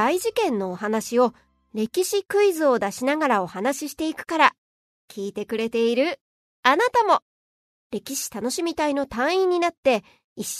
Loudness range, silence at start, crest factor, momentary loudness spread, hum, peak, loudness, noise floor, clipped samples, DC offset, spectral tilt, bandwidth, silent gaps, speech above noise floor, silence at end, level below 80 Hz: 2 LU; 0 s; 22 dB; 10 LU; none; -2 dBFS; -23 LUFS; under -90 dBFS; under 0.1%; under 0.1%; -3.5 dB/octave; 13.5 kHz; 4.58-5.08 s, 6.21-6.63 s, 7.22-7.90 s, 9.77-9.83 s, 10.24-10.36 s; over 68 dB; 0 s; -62 dBFS